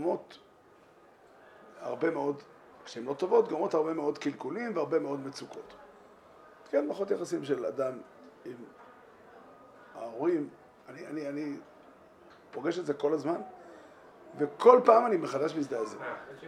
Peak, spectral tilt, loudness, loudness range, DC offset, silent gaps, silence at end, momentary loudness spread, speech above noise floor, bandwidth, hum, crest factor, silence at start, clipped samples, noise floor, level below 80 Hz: -6 dBFS; -6 dB/octave; -30 LUFS; 11 LU; under 0.1%; none; 0 s; 23 LU; 29 dB; 10.5 kHz; none; 26 dB; 0 s; under 0.1%; -59 dBFS; -80 dBFS